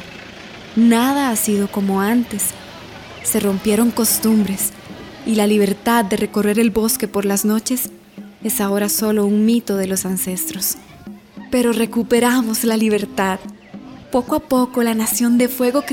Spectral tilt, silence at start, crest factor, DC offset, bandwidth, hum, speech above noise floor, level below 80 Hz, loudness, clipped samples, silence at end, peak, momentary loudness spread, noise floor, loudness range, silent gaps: -4 dB/octave; 0 s; 14 dB; under 0.1%; over 20 kHz; none; 21 dB; -50 dBFS; -17 LUFS; under 0.1%; 0 s; -4 dBFS; 19 LU; -37 dBFS; 2 LU; none